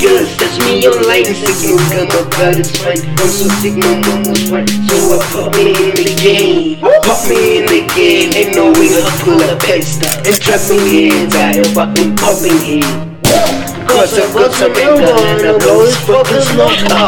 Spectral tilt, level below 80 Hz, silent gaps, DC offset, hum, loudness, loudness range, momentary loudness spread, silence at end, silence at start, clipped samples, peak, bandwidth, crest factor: -4 dB/octave; -38 dBFS; none; under 0.1%; none; -9 LUFS; 3 LU; 5 LU; 0 s; 0 s; under 0.1%; 0 dBFS; 19.5 kHz; 10 dB